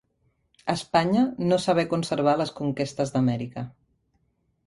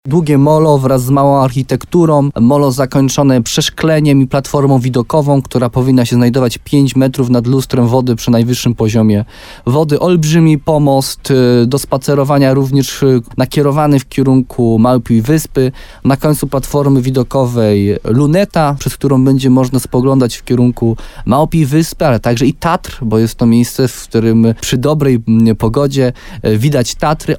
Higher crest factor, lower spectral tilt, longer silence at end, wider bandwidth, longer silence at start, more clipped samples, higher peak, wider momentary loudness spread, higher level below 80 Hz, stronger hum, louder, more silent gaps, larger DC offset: first, 18 dB vs 10 dB; about the same, -6 dB/octave vs -6.5 dB/octave; first, 0.95 s vs 0 s; second, 11.5 kHz vs 17.5 kHz; first, 0.65 s vs 0.05 s; neither; second, -8 dBFS vs 0 dBFS; first, 11 LU vs 5 LU; second, -60 dBFS vs -34 dBFS; neither; second, -25 LUFS vs -11 LUFS; neither; neither